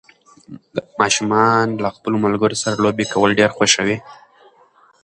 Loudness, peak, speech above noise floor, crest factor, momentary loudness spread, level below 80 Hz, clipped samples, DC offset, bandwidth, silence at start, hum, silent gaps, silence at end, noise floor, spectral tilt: -17 LUFS; 0 dBFS; 35 dB; 18 dB; 10 LU; -54 dBFS; under 0.1%; under 0.1%; 11.5 kHz; 0.5 s; none; none; 0.9 s; -53 dBFS; -3.5 dB/octave